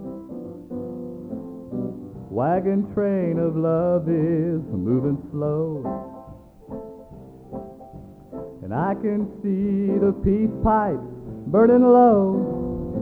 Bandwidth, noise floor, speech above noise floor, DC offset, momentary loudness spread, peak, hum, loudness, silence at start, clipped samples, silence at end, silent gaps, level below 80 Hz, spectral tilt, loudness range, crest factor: 4.3 kHz; -43 dBFS; 24 dB; under 0.1%; 21 LU; -6 dBFS; none; -21 LUFS; 0 s; under 0.1%; 0 s; none; -44 dBFS; -11.5 dB/octave; 12 LU; 16 dB